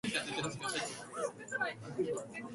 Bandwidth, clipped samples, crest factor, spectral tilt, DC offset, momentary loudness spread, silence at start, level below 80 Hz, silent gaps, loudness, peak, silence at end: 11.5 kHz; under 0.1%; 18 dB; -3 dB/octave; under 0.1%; 5 LU; 0.05 s; -72 dBFS; none; -38 LUFS; -20 dBFS; 0 s